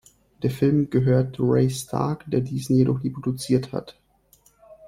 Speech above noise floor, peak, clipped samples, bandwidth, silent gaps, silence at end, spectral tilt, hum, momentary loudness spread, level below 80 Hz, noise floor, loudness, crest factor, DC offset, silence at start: 37 dB; -6 dBFS; under 0.1%; 15 kHz; none; 0 s; -7.5 dB/octave; none; 8 LU; -52 dBFS; -59 dBFS; -23 LUFS; 18 dB; under 0.1%; 0.4 s